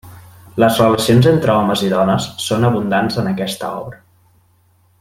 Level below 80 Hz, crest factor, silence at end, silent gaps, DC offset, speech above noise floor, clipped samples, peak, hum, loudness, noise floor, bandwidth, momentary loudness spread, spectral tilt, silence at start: -50 dBFS; 14 dB; 1.05 s; none; under 0.1%; 41 dB; under 0.1%; -2 dBFS; none; -15 LUFS; -55 dBFS; 16.5 kHz; 13 LU; -6 dB/octave; 0.05 s